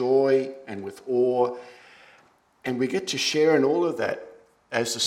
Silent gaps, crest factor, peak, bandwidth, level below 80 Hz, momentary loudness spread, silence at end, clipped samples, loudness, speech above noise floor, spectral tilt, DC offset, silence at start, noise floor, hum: none; 18 dB; -6 dBFS; 16 kHz; -74 dBFS; 16 LU; 0 s; under 0.1%; -24 LUFS; 35 dB; -4 dB/octave; under 0.1%; 0 s; -59 dBFS; none